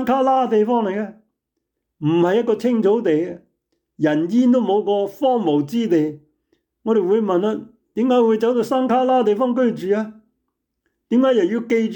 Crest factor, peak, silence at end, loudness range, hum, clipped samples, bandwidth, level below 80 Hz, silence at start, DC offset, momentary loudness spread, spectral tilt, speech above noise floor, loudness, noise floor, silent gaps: 10 dB; -8 dBFS; 0 s; 2 LU; none; under 0.1%; 19.5 kHz; -66 dBFS; 0 s; under 0.1%; 9 LU; -7 dB/octave; 60 dB; -18 LUFS; -78 dBFS; none